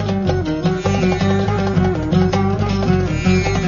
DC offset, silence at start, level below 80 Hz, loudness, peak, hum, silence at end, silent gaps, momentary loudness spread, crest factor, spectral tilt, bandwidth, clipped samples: under 0.1%; 0 s; -30 dBFS; -17 LUFS; -2 dBFS; none; 0 s; none; 3 LU; 14 dB; -7 dB/octave; 7.4 kHz; under 0.1%